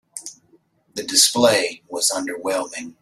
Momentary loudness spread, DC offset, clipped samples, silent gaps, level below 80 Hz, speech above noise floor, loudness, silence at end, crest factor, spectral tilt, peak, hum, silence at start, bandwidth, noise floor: 20 LU; under 0.1%; under 0.1%; none; -64 dBFS; 39 dB; -18 LUFS; 0.1 s; 22 dB; -1 dB/octave; 0 dBFS; none; 0.15 s; 16 kHz; -59 dBFS